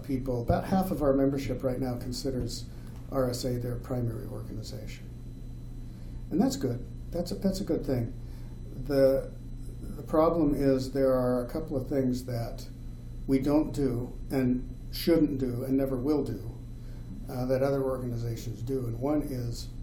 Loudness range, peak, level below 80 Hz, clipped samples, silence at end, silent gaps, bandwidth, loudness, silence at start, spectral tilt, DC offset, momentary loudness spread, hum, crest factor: 6 LU; -12 dBFS; -42 dBFS; under 0.1%; 0 s; none; 18.5 kHz; -30 LUFS; 0 s; -7 dB/octave; under 0.1%; 18 LU; none; 18 dB